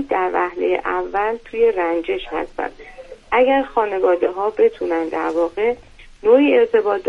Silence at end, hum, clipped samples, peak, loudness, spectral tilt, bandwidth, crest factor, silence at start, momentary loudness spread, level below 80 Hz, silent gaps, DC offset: 0 s; none; under 0.1%; -2 dBFS; -18 LUFS; -5.5 dB/octave; 6.6 kHz; 16 dB; 0 s; 10 LU; -48 dBFS; none; under 0.1%